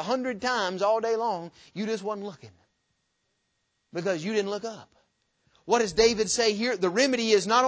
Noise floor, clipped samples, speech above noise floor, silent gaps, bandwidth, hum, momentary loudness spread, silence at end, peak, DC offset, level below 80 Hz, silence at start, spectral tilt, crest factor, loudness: -76 dBFS; under 0.1%; 50 dB; none; 8 kHz; none; 14 LU; 0 s; -8 dBFS; under 0.1%; -60 dBFS; 0 s; -3 dB/octave; 20 dB; -26 LUFS